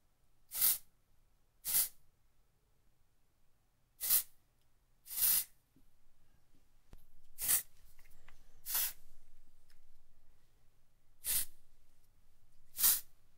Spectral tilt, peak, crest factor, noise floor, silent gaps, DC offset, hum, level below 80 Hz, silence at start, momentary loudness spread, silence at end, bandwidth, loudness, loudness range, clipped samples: 2 dB/octave; -14 dBFS; 28 dB; -70 dBFS; none; under 0.1%; none; -62 dBFS; 0.5 s; 15 LU; 0 s; 16 kHz; -33 LUFS; 8 LU; under 0.1%